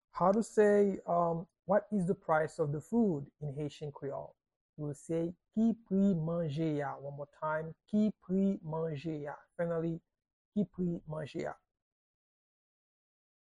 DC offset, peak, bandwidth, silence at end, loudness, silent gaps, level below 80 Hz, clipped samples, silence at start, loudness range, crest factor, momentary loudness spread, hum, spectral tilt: under 0.1%; -16 dBFS; 11 kHz; 1.95 s; -34 LUFS; 4.56-4.73 s, 10.33-10.52 s; -68 dBFS; under 0.1%; 0.15 s; 8 LU; 18 dB; 13 LU; none; -8 dB/octave